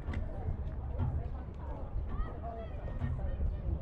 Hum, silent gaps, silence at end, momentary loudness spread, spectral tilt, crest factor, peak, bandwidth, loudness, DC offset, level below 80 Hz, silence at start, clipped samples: none; none; 0 s; 6 LU; -10 dB/octave; 14 dB; -24 dBFS; 4.3 kHz; -40 LUFS; under 0.1%; -38 dBFS; 0 s; under 0.1%